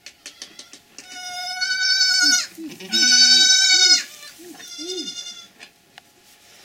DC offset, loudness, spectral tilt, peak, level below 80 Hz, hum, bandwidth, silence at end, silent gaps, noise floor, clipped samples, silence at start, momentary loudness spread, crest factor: under 0.1%; -14 LUFS; 2.5 dB/octave; -2 dBFS; -72 dBFS; none; 16 kHz; 1 s; none; -52 dBFS; under 0.1%; 0.05 s; 24 LU; 18 dB